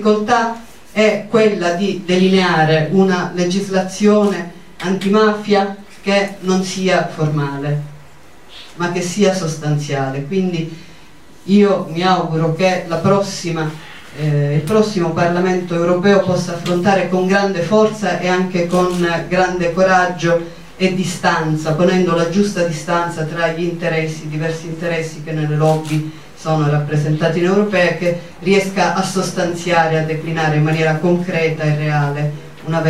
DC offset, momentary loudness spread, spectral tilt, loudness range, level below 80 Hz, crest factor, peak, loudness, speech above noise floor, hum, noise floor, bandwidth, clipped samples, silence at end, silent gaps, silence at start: 1%; 9 LU; -6 dB/octave; 4 LU; -50 dBFS; 14 dB; -2 dBFS; -16 LUFS; 28 dB; none; -44 dBFS; 13.5 kHz; under 0.1%; 0 s; none; 0 s